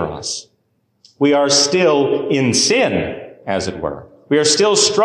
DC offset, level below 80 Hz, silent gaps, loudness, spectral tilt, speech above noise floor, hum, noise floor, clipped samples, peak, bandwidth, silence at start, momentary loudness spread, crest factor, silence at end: under 0.1%; -46 dBFS; none; -15 LUFS; -3 dB/octave; 49 dB; none; -64 dBFS; under 0.1%; -2 dBFS; 12.5 kHz; 0 s; 14 LU; 14 dB; 0 s